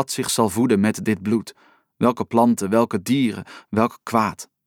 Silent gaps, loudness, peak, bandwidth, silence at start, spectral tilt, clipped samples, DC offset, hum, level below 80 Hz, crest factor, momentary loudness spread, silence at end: none; -21 LUFS; -4 dBFS; 17.5 kHz; 0 s; -5 dB/octave; under 0.1%; under 0.1%; none; -60 dBFS; 18 dB; 7 LU; 0.2 s